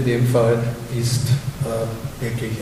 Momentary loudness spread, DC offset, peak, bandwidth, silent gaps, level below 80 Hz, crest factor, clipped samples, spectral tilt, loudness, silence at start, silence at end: 9 LU; under 0.1%; -6 dBFS; 16 kHz; none; -42 dBFS; 14 dB; under 0.1%; -6 dB/octave; -21 LUFS; 0 s; 0 s